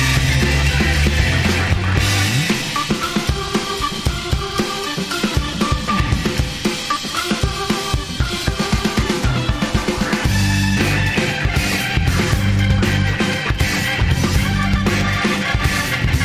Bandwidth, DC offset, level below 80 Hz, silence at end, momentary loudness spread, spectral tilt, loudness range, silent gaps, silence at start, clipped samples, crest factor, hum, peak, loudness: 16 kHz; under 0.1%; -24 dBFS; 0 s; 5 LU; -4.5 dB/octave; 3 LU; none; 0 s; under 0.1%; 16 dB; none; 0 dBFS; -18 LUFS